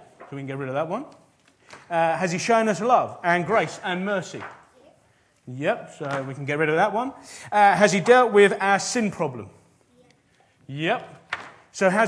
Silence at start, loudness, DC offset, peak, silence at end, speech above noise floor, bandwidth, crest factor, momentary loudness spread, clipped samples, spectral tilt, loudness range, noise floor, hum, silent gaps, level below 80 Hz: 0.2 s; -22 LUFS; under 0.1%; -2 dBFS; 0 s; 40 dB; 11 kHz; 22 dB; 20 LU; under 0.1%; -4.5 dB/octave; 8 LU; -62 dBFS; none; none; -70 dBFS